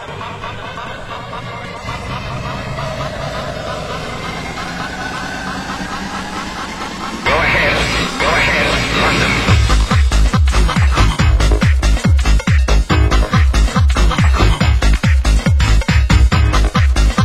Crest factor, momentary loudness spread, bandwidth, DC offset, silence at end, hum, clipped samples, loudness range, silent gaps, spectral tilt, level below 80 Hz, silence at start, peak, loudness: 14 dB; 12 LU; 12.5 kHz; under 0.1%; 0 s; none; under 0.1%; 10 LU; none; -5 dB/octave; -16 dBFS; 0 s; 0 dBFS; -15 LUFS